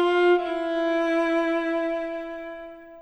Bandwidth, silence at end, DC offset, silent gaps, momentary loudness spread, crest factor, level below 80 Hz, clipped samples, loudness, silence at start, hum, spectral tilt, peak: 8.2 kHz; 0 s; under 0.1%; none; 16 LU; 12 dB; -58 dBFS; under 0.1%; -24 LUFS; 0 s; none; -4 dB/octave; -12 dBFS